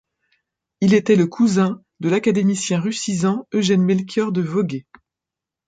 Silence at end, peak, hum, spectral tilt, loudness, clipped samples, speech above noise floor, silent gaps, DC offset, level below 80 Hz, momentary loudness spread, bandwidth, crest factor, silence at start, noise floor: 0.85 s; -4 dBFS; none; -6 dB/octave; -19 LUFS; under 0.1%; 69 dB; none; under 0.1%; -62 dBFS; 7 LU; 9.4 kHz; 16 dB; 0.8 s; -87 dBFS